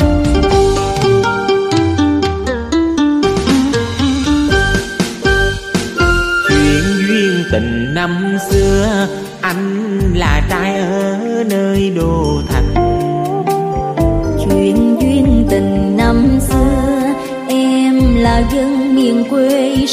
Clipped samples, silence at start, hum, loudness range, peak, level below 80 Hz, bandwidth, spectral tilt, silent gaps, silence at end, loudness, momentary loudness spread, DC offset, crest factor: under 0.1%; 0 s; none; 2 LU; 0 dBFS; -22 dBFS; 15.5 kHz; -6 dB/octave; none; 0 s; -13 LUFS; 5 LU; under 0.1%; 12 dB